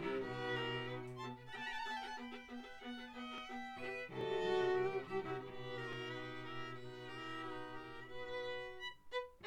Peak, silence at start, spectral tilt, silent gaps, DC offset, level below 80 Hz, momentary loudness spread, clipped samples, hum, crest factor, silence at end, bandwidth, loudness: -26 dBFS; 0 s; -5.5 dB/octave; none; under 0.1%; -68 dBFS; 12 LU; under 0.1%; none; 18 dB; 0 s; 12.5 kHz; -44 LUFS